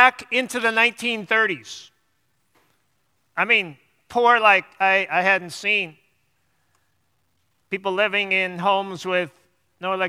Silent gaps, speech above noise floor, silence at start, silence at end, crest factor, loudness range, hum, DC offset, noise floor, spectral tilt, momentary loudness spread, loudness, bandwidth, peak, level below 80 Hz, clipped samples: none; 49 dB; 0 s; 0 s; 22 dB; 5 LU; none; under 0.1%; -70 dBFS; -3 dB/octave; 15 LU; -20 LUFS; 15 kHz; 0 dBFS; -72 dBFS; under 0.1%